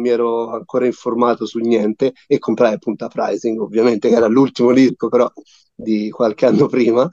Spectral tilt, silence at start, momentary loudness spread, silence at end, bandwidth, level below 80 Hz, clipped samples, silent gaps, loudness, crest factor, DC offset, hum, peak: -7 dB/octave; 0 s; 8 LU; 0 s; 7.6 kHz; -64 dBFS; under 0.1%; none; -16 LUFS; 14 dB; under 0.1%; none; -2 dBFS